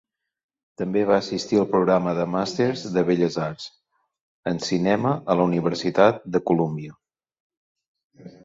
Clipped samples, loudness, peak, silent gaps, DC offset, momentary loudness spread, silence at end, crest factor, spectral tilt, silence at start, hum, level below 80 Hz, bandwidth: under 0.1%; -22 LUFS; -2 dBFS; 4.21-4.43 s, 7.40-7.50 s, 7.57-7.76 s, 7.88-7.95 s, 8.04-8.10 s; under 0.1%; 12 LU; 0.15 s; 20 dB; -6.5 dB/octave; 0.8 s; none; -60 dBFS; 7.8 kHz